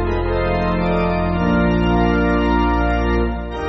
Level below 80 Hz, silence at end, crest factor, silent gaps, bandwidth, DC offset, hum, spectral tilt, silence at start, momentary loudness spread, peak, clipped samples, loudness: -24 dBFS; 0 s; 12 dB; none; 6 kHz; under 0.1%; none; -6 dB/octave; 0 s; 3 LU; -4 dBFS; under 0.1%; -18 LUFS